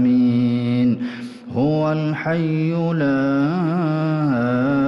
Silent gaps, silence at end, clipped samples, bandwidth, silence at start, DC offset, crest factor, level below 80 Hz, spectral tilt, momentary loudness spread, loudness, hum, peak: none; 0 s; under 0.1%; 6.2 kHz; 0 s; under 0.1%; 8 dB; -56 dBFS; -9 dB/octave; 4 LU; -19 LUFS; none; -10 dBFS